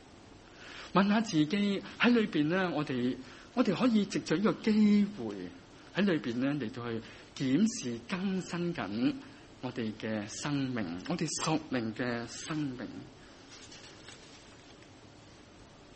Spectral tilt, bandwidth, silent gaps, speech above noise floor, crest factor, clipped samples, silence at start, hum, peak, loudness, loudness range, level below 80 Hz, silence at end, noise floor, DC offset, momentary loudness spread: -5.5 dB/octave; 8.4 kHz; none; 24 dB; 22 dB; under 0.1%; 0 s; none; -12 dBFS; -32 LUFS; 10 LU; -64 dBFS; 0.1 s; -55 dBFS; under 0.1%; 21 LU